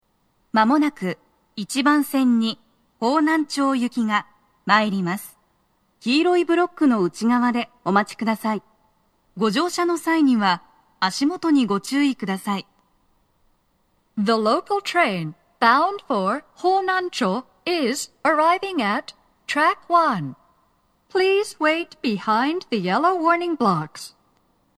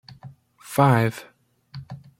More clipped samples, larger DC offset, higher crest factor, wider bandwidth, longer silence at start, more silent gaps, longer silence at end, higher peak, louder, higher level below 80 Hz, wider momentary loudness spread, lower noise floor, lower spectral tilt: neither; neither; about the same, 20 dB vs 22 dB; second, 14 kHz vs 16.5 kHz; first, 0.55 s vs 0.25 s; neither; first, 0.7 s vs 0.25 s; about the same, -2 dBFS vs -4 dBFS; about the same, -21 LUFS vs -21 LUFS; second, -70 dBFS vs -60 dBFS; second, 10 LU vs 24 LU; first, -66 dBFS vs -46 dBFS; second, -5 dB/octave vs -7 dB/octave